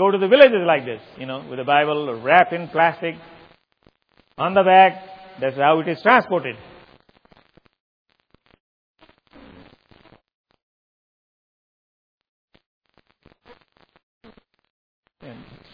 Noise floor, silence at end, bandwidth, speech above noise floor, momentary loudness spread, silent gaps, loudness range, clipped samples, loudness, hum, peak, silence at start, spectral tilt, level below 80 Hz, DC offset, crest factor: -61 dBFS; 0.4 s; 5.4 kHz; 43 dB; 20 LU; 7.80-8.05 s, 8.60-8.94 s, 10.34-10.44 s, 10.62-12.18 s, 12.28-12.48 s, 12.66-12.81 s, 14.03-14.21 s, 14.70-15.03 s; 6 LU; under 0.1%; -17 LUFS; none; 0 dBFS; 0 s; -8 dB/octave; -66 dBFS; under 0.1%; 22 dB